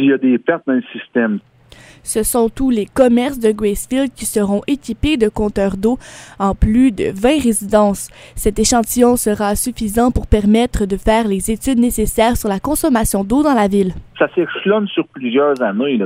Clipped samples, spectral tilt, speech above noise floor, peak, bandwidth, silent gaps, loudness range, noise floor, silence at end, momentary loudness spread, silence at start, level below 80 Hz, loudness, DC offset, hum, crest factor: under 0.1%; -5 dB/octave; 28 dB; 0 dBFS; 16 kHz; none; 2 LU; -43 dBFS; 0 s; 7 LU; 0 s; -30 dBFS; -16 LUFS; under 0.1%; none; 16 dB